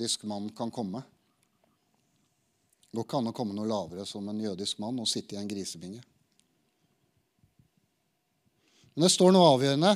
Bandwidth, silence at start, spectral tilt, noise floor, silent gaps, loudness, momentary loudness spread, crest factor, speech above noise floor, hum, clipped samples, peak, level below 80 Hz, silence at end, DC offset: 14.5 kHz; 0 s; -4.5 dB/octave; -76 dBFS; none; -28 LUFS; 19 LU; 22 dB; 49 dB; none; under 0.1%; -8 dBFS; -76 dBFS; 0 s; under 0.1%